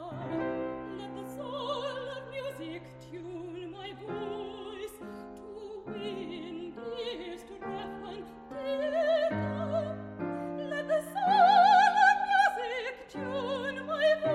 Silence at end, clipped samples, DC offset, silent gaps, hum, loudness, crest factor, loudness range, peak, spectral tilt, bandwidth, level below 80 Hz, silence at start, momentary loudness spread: 0 s; under 0.1%; under 0.1%; none; none; -30 LUFS; 20 dB; 15 LU; -12 dBFS; -5 dB/octave; 13.5 kHz; -64 dBFS; 0 s; 20 LU